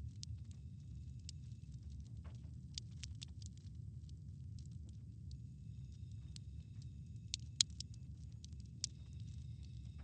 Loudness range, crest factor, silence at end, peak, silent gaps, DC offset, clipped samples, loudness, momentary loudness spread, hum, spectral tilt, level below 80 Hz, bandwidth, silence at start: 8 LU; 40 dB; 0 s; -10 dBFS; none; under 0.1%; under 0.1%; -49 LUFS; 7 LU; none; -2.5 dB/octave; -56 dBFS; 9 kHz; 0 s